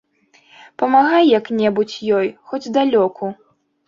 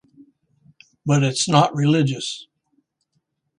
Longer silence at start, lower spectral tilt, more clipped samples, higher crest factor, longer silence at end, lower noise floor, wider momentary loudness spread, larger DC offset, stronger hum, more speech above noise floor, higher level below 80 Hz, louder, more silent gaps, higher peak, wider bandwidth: second, 0.8 s vs 1.05 s; about the same, -6 dB/octave vs -5 dB/octave; neither; second, 16 dB vs 22 dB; second, 0.55 s vs 1.15 s; second, -54 dBFS vs -72 dBFS; about the same, 12 LU vs 13 LU; neither; neither; second, 38 dB vs 54 dB; about the same, -64 dBFS vs -62 dBFS; first, -16 LUFS vs -19 LUFS; neither; about the same, -2 dBFS vs 0 dBFS; second, 7.6 kHz vs 11 kHz